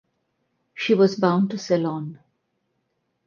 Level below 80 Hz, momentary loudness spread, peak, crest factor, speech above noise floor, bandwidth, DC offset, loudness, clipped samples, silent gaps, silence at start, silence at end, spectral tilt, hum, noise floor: -72 dBFS; 16 LU; -6 dBFS; 20 dB; 53 dB; 7.2 kHz; under 0.1%; -21 LUFS; under 0.1%; none; 0.75 s; 1.1 s; -6.5 dB/octave; none; -74 dBFS